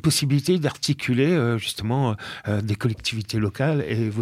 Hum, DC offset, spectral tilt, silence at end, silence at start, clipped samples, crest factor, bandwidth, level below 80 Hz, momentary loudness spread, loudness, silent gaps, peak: none; under 0.1%; -5.5 dB/octave; 0 s; 0.05 s; under 0.1%; 14 dB; 15.5 kHz; -52 dBFS; 6 LU; -23 LUFS; none; -8 dBFS